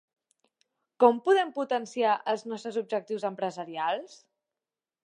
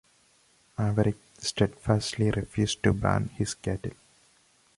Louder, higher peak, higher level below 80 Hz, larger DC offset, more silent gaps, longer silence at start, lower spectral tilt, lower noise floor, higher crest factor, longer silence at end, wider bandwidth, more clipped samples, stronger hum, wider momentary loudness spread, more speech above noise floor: about the same, -28 LUFS vs -28 LUFS; about the same, -6 dBFS vs -8 dBFS; second, -88 dBFS vs -46 dBFS; neither; neither; first, 1 s vs 0.8 s; about the same, -4.5 dB/octave vs -5.5 dB/octave; first, under -90 dBFS vs -64 dBFS; about the same, 24 dB vs 20 dB; about the same, 0.95 s vs 0.85 s; second, 10 kHz vs 11.5 kHz; neither; neither; first, 11 LU vs 8 LU; first, over 62 dB vs 36 dB